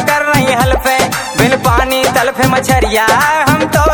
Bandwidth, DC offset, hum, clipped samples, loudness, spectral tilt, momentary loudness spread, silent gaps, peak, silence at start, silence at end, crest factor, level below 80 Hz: over 20 kHz; under 0.1%; none; 0.2%; -11 LUFS; -4 dB/octave; 2 LU; none; 0 dBFS; 0 s; 0 s; 10 dB; -24 dBFS